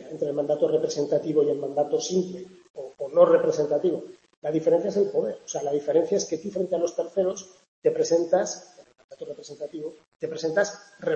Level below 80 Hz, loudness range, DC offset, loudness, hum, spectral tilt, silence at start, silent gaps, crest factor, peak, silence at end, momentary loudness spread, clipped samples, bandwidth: -74 dBFS; 4 LU; under 0.1%; -25 LUFS; none; -5 dB/octave; 0 s; 2.70-2.74 s, 4.37-4.42 s, 7.68-7.82 s, 9.04-9.09 s, 10.08-10.12 s; 20 dB; -6 dBFS; 0 s; 16 LU; under 0.1%; 8.2 kHz